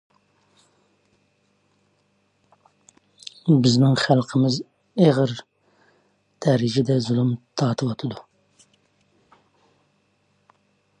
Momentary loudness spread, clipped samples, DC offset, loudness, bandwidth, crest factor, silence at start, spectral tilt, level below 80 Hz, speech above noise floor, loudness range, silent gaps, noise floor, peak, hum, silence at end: 15 LU; under 0.1%; under 0.1%; -21 LUFS; 10 kHz; 20 dB; 3.45 s; -6.5 dB/octave; -64 dBFS; 47 dB; 10 LU; none; -66 dBFS; -4 dBFS; 50 Hz at -60 dBFS; 2.8 s